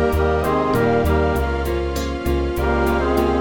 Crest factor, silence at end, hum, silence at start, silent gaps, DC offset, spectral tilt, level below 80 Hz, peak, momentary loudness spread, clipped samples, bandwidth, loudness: 14 dB; 0 s; none; 0 s; none; under 0.1%; -7 dB/octave; -26 dBFS; -4 dBFS; 5 LU; under 0.1%; over 20 kHz; -19 LUFS